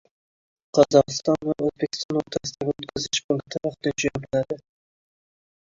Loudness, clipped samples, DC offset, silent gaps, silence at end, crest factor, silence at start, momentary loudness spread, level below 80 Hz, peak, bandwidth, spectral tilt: -24 LUFS; under 0.1%; under 0.1%; 2.05-2.09 s, 3.24-3.29 s; 1.1 s; 22 dB; 0.75 s; 11 LU; -58 dBFS; -2 dBFS; 7.8 kHz; -4.5 dB/octave